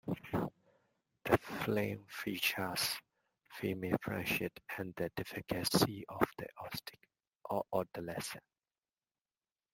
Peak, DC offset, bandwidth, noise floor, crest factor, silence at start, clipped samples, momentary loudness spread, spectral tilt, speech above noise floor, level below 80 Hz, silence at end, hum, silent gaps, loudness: -12 dBFS; under 0.1%; 16.5 kHz; under -90 dBFS; 28 dB; 0.05 s; under 0.1%; 11 LU; -4.5 dB/octave; over 52 dB; -66 dBFS; 1.35 s; none; 7.35-7.39 s; -38 LUFS